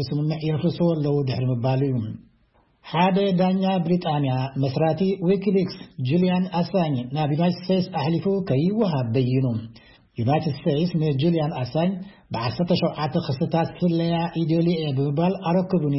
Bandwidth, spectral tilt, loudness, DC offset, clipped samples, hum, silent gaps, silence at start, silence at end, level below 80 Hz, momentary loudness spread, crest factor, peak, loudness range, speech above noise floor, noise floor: 5.8 kHz; -11.5 dB/octave; -23 LUFS; under 0.1%; under 0.1%; none; none; 0 s; 0 s; -56 dBFS; 5 LU; 16 dB; -6 dBFS; 2 LU; 39 dB; -61 dBFS